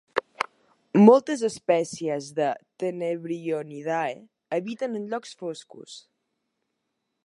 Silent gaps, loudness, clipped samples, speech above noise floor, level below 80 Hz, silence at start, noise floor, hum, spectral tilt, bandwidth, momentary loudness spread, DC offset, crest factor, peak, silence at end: none; -25 LUFS; under 0.1%; 55 dB; -78 dBFS; 0.15 s; -79 dBFS; none; -6 dB/octave; 11.5 kHz; 20 LU; under 0.1%; 24 dB; -2 dBFS; 1.25 s